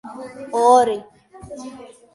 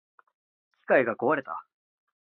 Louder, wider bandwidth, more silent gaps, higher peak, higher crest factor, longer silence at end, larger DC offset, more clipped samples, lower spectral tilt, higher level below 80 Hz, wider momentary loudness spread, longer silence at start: first, -17 LUFS vs -26 LUFS; first, 11.5 kHz vs 4.2 kHz; neither; first, -2 dBFS vs -8 dBFS; about the same, 18 dB vs 22 dB; second, 0.35 s vs 0.7 s; neither; neither; second, -4 dB/octave vs -9.5 dB/octave; first, -58 dBFS vs -78 dBFS; first, 23 LU vs 16 LU; second, 0.05 s vs 0.9 s